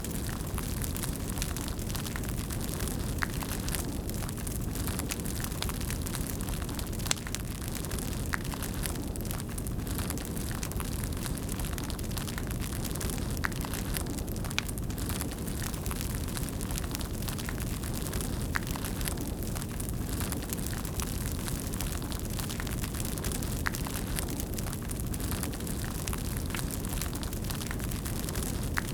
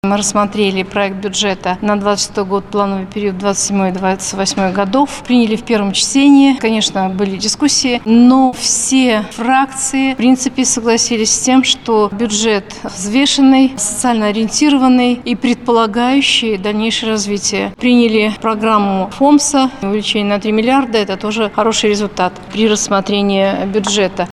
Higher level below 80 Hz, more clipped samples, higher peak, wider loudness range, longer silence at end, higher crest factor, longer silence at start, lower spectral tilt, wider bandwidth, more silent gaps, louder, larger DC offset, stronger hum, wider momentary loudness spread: first, -38 dBFS vs -44 dBFS; neither; second, -4 dBFS vs 0 dBFS; second, 1 LU vs 4 LU; about the same, 0 s vs 0 s; first, 30 dB vs 12 dB; about the same, 0 s vs 0.05 s; about the same, -4 dB/octave vs -3.5 dB/octave; first, over 20 kHz vs 12.5 kHz; neither; second, -34 LUFS vs -13 LUFS; neither; neither; second, 2 LU vs 7 LU